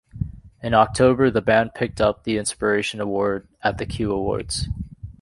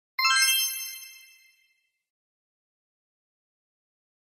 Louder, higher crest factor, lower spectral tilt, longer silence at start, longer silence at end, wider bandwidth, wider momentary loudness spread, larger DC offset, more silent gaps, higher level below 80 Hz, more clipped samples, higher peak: about the same, -21 LUFS vs -22 LUFS; about the same, 18 dB vs 22 dB; first, -5 dB/octave vs 11 dB/octave; about the same, 0.15 s vs 0.2 s; second, 0.1 s vs 3.25 s; second, 11.5 kHz vs 16 kHz; second, 15 LU vs 21 LU; neither; neither; first, -40 dBFS vs under -90 dBFS; neither; first, -4 dBFS vs -10 dBFS